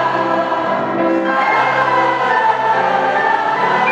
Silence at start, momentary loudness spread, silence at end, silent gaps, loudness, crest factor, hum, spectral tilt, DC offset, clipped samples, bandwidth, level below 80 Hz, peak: 0 s; 3 LU; 0 s; none; -15 LUFS; 12 dB; none; -5.5 dB/octave; under 0.1%; under 0.1%; 9.2 kHz; -62 dBFS; -2 dBFS